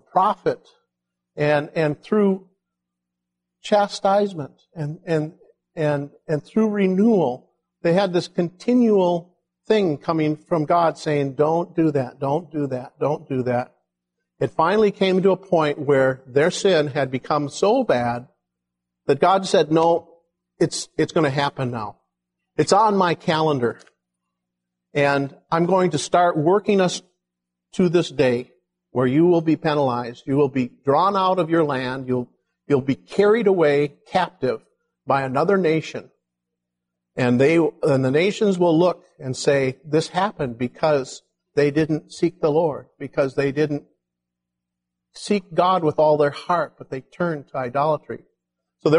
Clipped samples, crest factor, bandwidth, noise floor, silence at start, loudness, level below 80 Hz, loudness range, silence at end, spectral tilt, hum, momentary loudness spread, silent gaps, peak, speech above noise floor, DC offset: under 0.1%; 18 dB; 11.5 kHz; -83 dBFS; 0.15 s; -21 LUFS; -62 dBFS; 4 LU; 0 s; -6 dB/octave; 60 Hz at -50 dBFS; 10 LU; none; -2 dBFS; 63 dB; under 0.1%